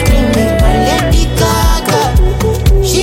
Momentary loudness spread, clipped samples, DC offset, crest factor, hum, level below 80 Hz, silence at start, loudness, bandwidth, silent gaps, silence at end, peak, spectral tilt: 1 LU; under 0.1%; under 0.1%; 10 dB; none; -12 dBFS; 0 s; -11 LUFS; 16.5 kHz; none; 0 s; 0 dBFS; -5 dB/octave